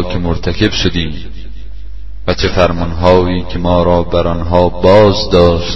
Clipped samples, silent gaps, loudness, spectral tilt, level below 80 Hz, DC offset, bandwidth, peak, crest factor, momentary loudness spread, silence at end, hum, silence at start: 0.2%; none; -12 LUFS; -6.5 dB/octave; -24 dBFS; 9%; 7.4 kHz; 0 dBFS; 12 dB; 23 LU; 0 s; none; 0 s